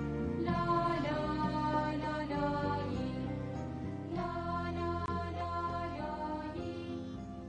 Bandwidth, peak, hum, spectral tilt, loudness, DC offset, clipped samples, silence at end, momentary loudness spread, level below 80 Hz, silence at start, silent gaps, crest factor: 9.8 kHz; -18 dBFS; none; -7.5 dB/octave; -36 LUFS; under 0.1%; under 0.1%; 0 s; 8 LU; -52 dBFS; 0 s; none; 16 dB